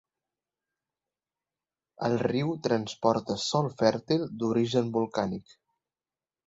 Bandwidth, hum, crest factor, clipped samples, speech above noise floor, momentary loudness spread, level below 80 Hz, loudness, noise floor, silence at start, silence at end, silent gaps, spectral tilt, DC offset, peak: 8 kHz; none; 22 dB; under 0.1%; over 62 dB; 5 LU; -66 dBFS; -28 LUFS; under -90 dBFS; 2 s; 1.05 s; none; -6 dB/octave; under 0.1%; -8 dBFS